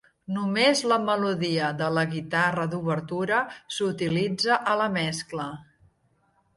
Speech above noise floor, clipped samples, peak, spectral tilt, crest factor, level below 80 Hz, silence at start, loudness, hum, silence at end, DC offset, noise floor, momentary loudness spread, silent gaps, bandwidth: 42 dB; under 0.1%; -8 dBFS; -4.5 dB/octave; 18 dB; -64 dBFS; 0.3 s; -25 LUFS; none; 0.95 s; under 0.1%; -67 dBFS; 10 LU; none; 11.5 kHz